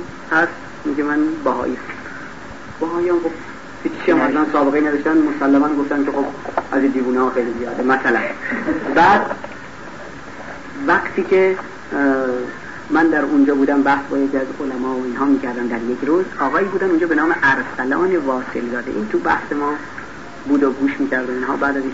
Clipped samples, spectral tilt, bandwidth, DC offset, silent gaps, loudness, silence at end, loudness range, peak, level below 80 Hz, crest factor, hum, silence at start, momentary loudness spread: under 0.1%; -6 dB/octave; 8 kHz; 1%; none; -18 LUFS; 0 s; 3 LU; -4 dBFS; -50 dBFS; 14 dB; none; 0 s; 16 LU